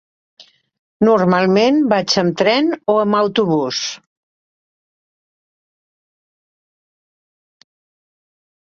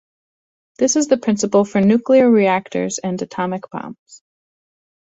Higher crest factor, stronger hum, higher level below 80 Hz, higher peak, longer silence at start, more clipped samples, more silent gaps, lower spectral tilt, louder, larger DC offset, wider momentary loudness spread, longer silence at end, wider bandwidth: about the same, 18 dB vs 16 dB; neither; about the same, -62 dBFS vs -60 dBFS; about the same, -2 dBFS vs -2 dBFS; second, 0.4 s vs 0.8 s; neither; first, 0.79-1.00 s vs 3.99-4.06 s; about the same, -5 dB/octave vs -5 dB/octave; about the same, -15 LUFS vs -17 LUFS; neither; second, 7 LU vs 13 LU; first, 4.75 s vs 0.9 s; about the same, 7.6 kHz vs 8.2 kHz